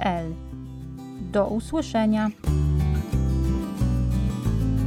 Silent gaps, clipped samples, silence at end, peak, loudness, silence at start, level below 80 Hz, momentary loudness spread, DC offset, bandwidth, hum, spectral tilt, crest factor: none; under 0.1%; 0 s; -10 dBFS; -25 LUFS; 0 s; -30 dBFS; 14 LU; under 0.1%; 15 kHz; none; -7.5 dB/octave; 14 dB